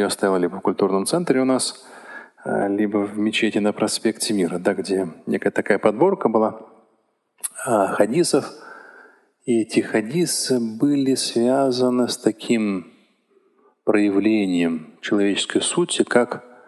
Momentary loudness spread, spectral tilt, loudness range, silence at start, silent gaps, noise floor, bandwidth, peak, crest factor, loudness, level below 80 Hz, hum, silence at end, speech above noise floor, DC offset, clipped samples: 9 LU; -4.5 dB/octave; 2 LU; 0 s; none; -66 dBFS; 12.5 kHz; -2 dBFS; 20 dB; -21 LUFS; -68 dBFS; none; 0.3 s; 46 dB; under 0.1%; under 0.1%